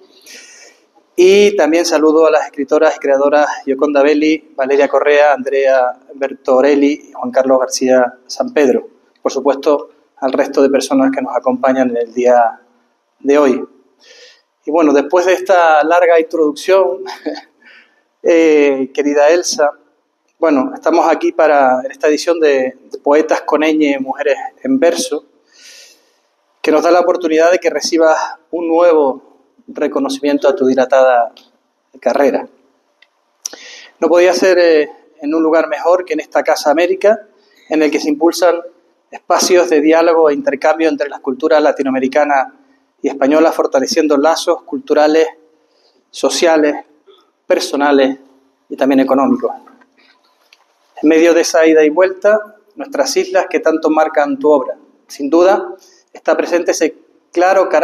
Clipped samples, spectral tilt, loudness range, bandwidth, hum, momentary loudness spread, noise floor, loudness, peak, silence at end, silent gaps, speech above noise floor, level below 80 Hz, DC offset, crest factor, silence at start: under 0.1%; -3 dB/octave; 3 LU; 13.5 kHz; none; 12 LU; -61 dBFS; -13 LUFS; 0 dBFS; 0 s; none; 49 dB; -68 dBFS; under 0.1%; 12 dB; 0.3 s